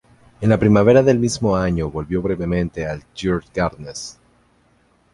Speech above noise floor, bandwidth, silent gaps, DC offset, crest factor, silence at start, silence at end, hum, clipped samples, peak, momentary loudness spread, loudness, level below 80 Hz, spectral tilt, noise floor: 40 dB; 11.5 kHz; none; under 0.1%; 18 dB; 0.4 s; 1 s; 60 Hz at -45 dBFS; under 0.1%; -2 dBFS; 15 LU; -18 LUFS; -38 dBFS; -6.5 dB/octave; -58 dBFS